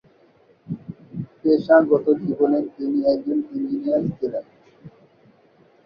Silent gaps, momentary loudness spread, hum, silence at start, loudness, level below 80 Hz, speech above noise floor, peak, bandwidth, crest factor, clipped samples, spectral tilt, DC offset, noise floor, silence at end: none; 19 LU; none; 0.7 s; -21 LUFS; -62 dBFS; 36 dB; -2 dBFS; 5.6 kHz; 20 dB; under 0.1%; -10 dB/octave; under 0.1%; -56 dBFS; 0.95 s